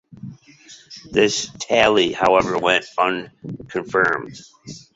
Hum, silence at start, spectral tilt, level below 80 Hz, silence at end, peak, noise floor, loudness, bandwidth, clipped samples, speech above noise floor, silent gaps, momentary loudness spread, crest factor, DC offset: none; 0.25 s; -3.5 dB/octave; -54 dBFS; 0.15 s; 0 dBFS; -39 dBFS; -19 LUFS; 8 kHz; under 0.1%; 19 dB; none; 23 LU; 20 dB; under 0.1%